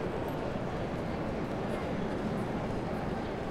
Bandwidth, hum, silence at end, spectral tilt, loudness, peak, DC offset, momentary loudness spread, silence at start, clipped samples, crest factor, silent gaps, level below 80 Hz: 15.5 kHz; none; 0 s; -7.5 dB/octave; -35 LUFS; -22 dBFS; under 0.1%; 1 LU; 0 s; under 0.1%; 12 dB; none; -46 dBFS